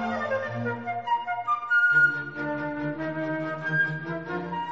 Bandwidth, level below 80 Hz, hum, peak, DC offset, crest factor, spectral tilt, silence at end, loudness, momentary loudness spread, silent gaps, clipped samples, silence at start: 7.6 kHz; -64 dBFS; none; -12 dBFS; 0.2%; 16 dB; -4 dB/octave; 0 s; -26 LUFS; 11 LU; none; under 0.1%; 0 s